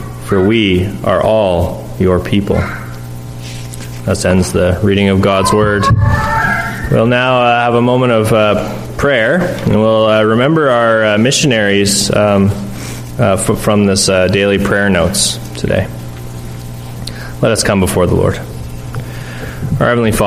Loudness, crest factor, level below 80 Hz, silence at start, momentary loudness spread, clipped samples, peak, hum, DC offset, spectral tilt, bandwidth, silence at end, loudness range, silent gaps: -12 LUFS; 12 dB; -30 dBFS; 0 s; 15 LU; under 0.1%; 0 dBFS; none; under 0.1%; -5 dB/octave; 15.5 kHz; 0 s; 5 LU; none